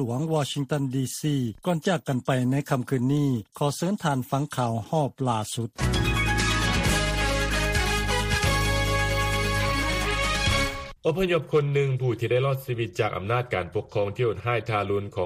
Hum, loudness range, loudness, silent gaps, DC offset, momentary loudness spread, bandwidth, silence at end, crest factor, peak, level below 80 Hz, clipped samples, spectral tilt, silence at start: none; 3 LU; -25 LUFS; none; under 0.1%; 5 LU; 15.5 kHz; 0 s; 16 dB; -10 dBFS; -36 dBFS; under 0.1%; -5 dB/octave; 0 s